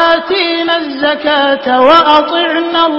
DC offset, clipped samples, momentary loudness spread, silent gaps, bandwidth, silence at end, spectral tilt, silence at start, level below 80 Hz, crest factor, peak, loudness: under 0.1%; 0.3%; 7 LU; none; 8 kHz; 0 s; -4.5 dB/octave; 0 s; -50 dBFS; 10 dB; 0 dBFS; -10 LUFS